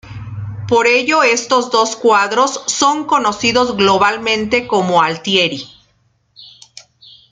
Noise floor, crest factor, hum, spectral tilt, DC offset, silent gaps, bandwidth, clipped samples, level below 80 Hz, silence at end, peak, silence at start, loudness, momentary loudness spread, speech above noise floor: -59 dBFS; 16 dB; none; -3 dB/octave; under 0.1%; none; 9.6 kHz; under 0.1%; -50 dBFS; 0.85 s; 0 dBFS; 0.05 s; -13 LUFS; 10 LU; 45 dB